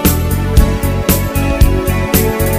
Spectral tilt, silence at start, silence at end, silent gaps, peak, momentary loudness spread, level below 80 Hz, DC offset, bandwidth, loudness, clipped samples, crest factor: -5.5 dB/octave; 0 s; 0 s; none; 0 dBFS; 3 LU; -16 dBFS; under 0.1%; 16 kHz; -13 LUFS; 0.4%; 12 dB